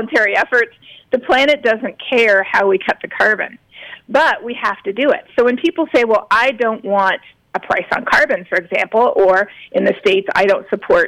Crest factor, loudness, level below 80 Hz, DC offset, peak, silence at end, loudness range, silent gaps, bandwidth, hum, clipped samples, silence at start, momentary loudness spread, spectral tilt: 12 dB; -15 LUFS; -52 dBFS; under 0.1%; -4 dBFS; 0 s; 2 LU; none; 13 kHz; none; under 0.1%; 0 s; 8 LU; -4.5 dB/octave